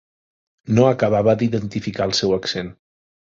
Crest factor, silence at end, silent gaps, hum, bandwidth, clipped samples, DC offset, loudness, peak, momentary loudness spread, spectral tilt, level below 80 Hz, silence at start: 18 dB; 0.5 s; none; none; 7.8 kHz; under 0.1%; under 0.1%; -19 LUFS; -2 dBFS; 10 LU; -6 dB/octave; -50 dBFS; 0.65 s